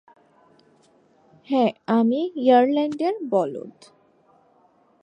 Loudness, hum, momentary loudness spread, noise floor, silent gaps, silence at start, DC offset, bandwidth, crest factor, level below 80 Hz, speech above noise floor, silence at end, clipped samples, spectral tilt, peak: -21 LUFS; none; 11 LU; -60 dBFS; none; 1.5 s; under 0.1%; 9.2 kHz; 18 dB; -78 dBFS; 39 dB; 1.35 s; under 0.1%; -7 dB/octave; -6 dBFS